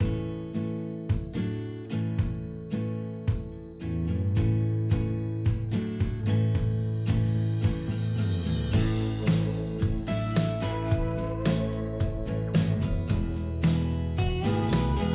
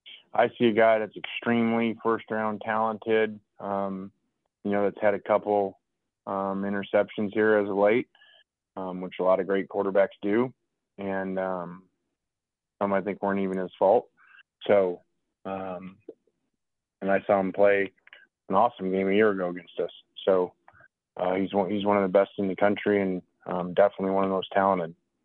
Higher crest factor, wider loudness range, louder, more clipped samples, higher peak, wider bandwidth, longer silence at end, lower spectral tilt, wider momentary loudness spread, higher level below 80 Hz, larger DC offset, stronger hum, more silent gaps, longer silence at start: about the same, 14 dB vs 18 dB; about the same, 4 LU vs 4 LU; second, -29 LUFS vs -26 LUFS; neither; second, -14 dBFS vs -8 dBFS; about the same, 4 kHz vs 4.2 kHz; second, 0 s vs 0.3 s; first, -12 dB/octave vs -9 dB/octave; second, 7 LU vs 13 LU; first, -36 dBFS vs -74 dBFS; neither; neither; neither; about the same, 0 s vs 0.05 s